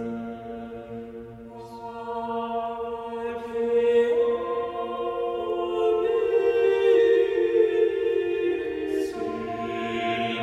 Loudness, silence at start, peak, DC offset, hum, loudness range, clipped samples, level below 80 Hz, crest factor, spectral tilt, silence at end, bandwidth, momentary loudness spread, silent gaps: -25 LUFS; 0 s; -8 dBFS; under 0.1%; none; 9 LU; under 0.1%; -58 dBFS; 16 dB; -6 dB/octave; 0 s; 8.6 kHz; 16 LU; none